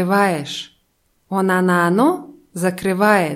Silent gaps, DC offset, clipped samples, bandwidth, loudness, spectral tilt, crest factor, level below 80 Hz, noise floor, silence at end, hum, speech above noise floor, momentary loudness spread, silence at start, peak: none; under 0.1%; under 0.1%; 16 kHz; -18 LUFS; -5.5 dB/octave; 16 dB; -60 dBFS; -64 dBFS; 0 s; none; 47 dB; 14 LU; 0 s; -2 dBFS